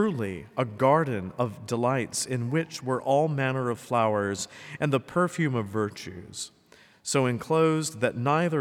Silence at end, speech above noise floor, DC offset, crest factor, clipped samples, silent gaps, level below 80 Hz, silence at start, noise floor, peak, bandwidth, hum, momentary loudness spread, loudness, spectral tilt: 0 s; 30 dB; under 0.1%; 18 dB; under 0.1%; none; -68 dBFS; 0 s; -56 dBFS; -10 dBFS; 16.5 kHz; none; 10 LU; -27 LUFS; -5.5 dB/octave